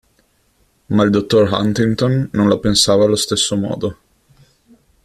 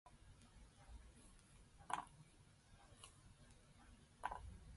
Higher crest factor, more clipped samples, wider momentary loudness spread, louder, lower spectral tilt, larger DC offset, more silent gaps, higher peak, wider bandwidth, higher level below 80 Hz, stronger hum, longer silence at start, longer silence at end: second, 16 dB vs 32 dB; neither; second, 7 LU vs 18 LU; first, -15 LUFS vs -56 LUFS; first, -5 dB/octave vs -3.5 dB/octave; neither; neither; first, -2 dBFS vs -26 dBFS; first, 14 kHz vs 11.5 kHz; first, -44 dBFS vs -66 dBFS; neither; first, 0.9 s vs 0.05 s; first, 1.1 s vs 0 s